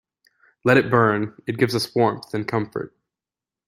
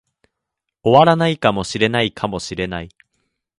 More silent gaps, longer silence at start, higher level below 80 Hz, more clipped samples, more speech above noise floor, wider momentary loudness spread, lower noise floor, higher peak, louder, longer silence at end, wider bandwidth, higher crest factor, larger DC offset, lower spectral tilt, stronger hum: neither; second, 0.65 s vs 0.85 s; second, -60 dBFS vs -48 dBFS; neither; first, 69 dB vs 63 dB; about the same, 12 LU vs 13 LU; first, -90 dBFS vs -80 dBFS; about the same, -2 dBFS vs 0 dBFS; second, -21 LUFS vs -17 LUFS; about the same, 0.8 s vs 0.7 s; first, 16 kHz vs 11.5 kHz; about the same, 20 dB vs 18 dB; neither; about the same, -6 dB/octave vs -5.5 dB/octave; neither